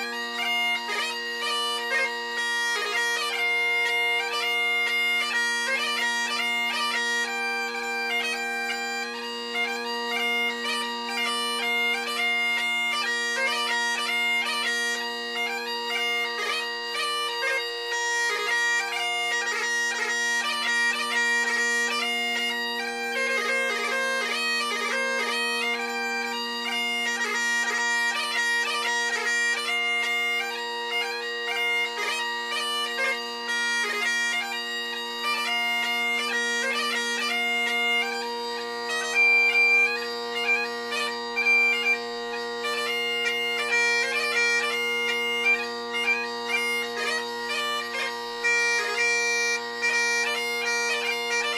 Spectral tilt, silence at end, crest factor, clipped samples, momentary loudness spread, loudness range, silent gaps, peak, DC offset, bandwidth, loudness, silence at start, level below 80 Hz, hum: 1 dB/octave; 0 s; 14 dB; under 0.1%; 6 LU; 4 LU; none; -12 dBFS; under 0.1%; 15.5 kHz; -24 LUFS; 0 s; -78 dBFS; 60 Hz at -85 dBFS